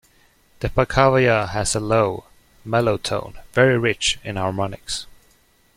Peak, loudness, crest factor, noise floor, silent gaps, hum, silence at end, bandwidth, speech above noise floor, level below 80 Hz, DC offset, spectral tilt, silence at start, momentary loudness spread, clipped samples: -2 dBFS; -20 LUFS; 20 dB; -58 dBFS; none; none; 0.75 s; 15.5 kHz; 38 dB; -42 dBFS; under 0.1%; -4.5 dB/octave; 0.6 s; 12 LU; under 0.1%